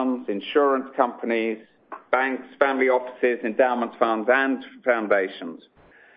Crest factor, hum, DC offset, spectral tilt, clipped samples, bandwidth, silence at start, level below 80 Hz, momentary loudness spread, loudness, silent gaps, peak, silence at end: 20 dB; none; under 0.1%; -8.5 dB/octave; under 0.1%; 5.2 kHz; 0 s; -72 dBFS; 9 LU; -23 LUFS; none; -4 dBFS; 0.6 s